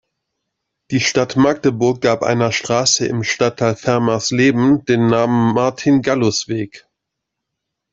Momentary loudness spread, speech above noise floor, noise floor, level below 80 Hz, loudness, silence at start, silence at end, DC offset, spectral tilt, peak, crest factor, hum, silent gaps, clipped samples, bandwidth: 5 LU; 63 dB; -79 dBFS; -54 dBFS; -16 LUFS; 0.9 s; 1.15 s; under 0.1%; -4.5 dB/octave; 0 dBFS; 16 dB; none; none; under 0.1%; 7.8 kHz